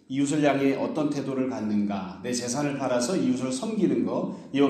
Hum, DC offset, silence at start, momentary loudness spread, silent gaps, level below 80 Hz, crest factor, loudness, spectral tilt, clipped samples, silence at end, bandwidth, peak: none; under 0.1%; 0.1 s; 7 LU; none; -68 dBFS; 18 dB; -27 LUFS; -5.5 dB/octave; under 0.1%; 0 s; 13 kHz; -8 dBFS